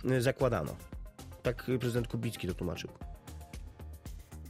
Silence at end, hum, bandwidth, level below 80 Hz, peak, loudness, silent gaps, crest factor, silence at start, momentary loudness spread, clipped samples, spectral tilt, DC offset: 0 s; none; 16 kHz; -48 dBFS; -16 dBFS; -35 LUFS; none; 20 dB; 0 s; 18 LU; under 0.1%; -6.5 dB/octave; under 0.1%